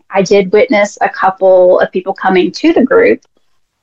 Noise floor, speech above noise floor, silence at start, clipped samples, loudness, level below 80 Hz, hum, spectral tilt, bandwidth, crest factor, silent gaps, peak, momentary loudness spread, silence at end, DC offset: -59 dBFS; 49 dB; 0.1 s; under 0.1%; -10 LUFS; -50 dBFS; none; -5.5 dB/octave; 7.8 kHz; 10 dB; none; 0 dBFS; 6 LU; 0.65 s; 0.4%